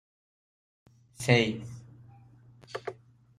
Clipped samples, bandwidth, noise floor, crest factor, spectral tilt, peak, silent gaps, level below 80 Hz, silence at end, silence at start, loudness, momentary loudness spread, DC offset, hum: under 0.1%; 14.5 kHz; -56 dBFS; 26 dB; -5.5 dB/octave; -6 dBFS; none; -66 dBFS; 0.45 s; 1.2 s; -29 LUFS; 20 LU; under 0.1%; none